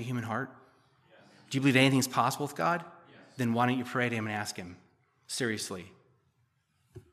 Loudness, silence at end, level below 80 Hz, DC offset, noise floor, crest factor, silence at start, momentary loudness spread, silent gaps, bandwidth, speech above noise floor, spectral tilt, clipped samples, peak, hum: -30 LUFS; 0.1 s; -76 dBFS; under 0.1%; -73 dBFS; 24 dB; 0 s; 19 LU; none; 15 kHz; 44 dB; -4.5 dB/octave; under 0.1%; -8 dBFS; none